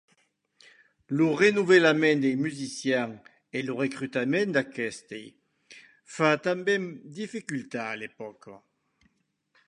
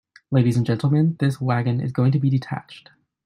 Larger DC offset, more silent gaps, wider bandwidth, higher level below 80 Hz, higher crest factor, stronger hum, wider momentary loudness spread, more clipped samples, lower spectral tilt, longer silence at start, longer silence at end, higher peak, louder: neither; neither; about the same, 11 kHz vs 10.5 kHz; second, -74 dBFS vs -58 dBFS; first, 22 dB vs 14 dB; neither; first, 18 LU vs 5 LU; neither; second, -5 dB/octave vs -8.5 dB/octave; first, 1.1 s vs 0.3 s; first, 1.1 s vs 0.45 s; about the same, -6 dBFS vs -6 dBFS; second, -26 LUFS vs -21 LUFS